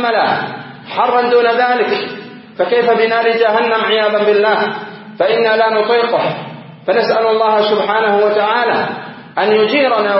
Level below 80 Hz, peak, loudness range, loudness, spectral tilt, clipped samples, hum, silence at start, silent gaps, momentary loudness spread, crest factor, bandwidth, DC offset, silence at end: -68 dBFS; 0 dBFS; 1 LU; -13 LUFS; -8.5 dB/octave; under 0.1%; none; 0 s; none; 13 LU; 14 dB; 5.8 kHz; under 0.1%; 0 s